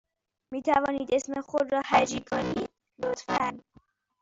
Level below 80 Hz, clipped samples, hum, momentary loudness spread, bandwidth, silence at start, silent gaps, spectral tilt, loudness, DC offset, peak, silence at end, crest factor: -60 dBFS; under 0.1%; none; 10 LU; 8 kHz; 0.5 s; none; -4 dB/octave; -28 LUFS; under 0.1%; -8 dBFS; 0.6 s; 20 dB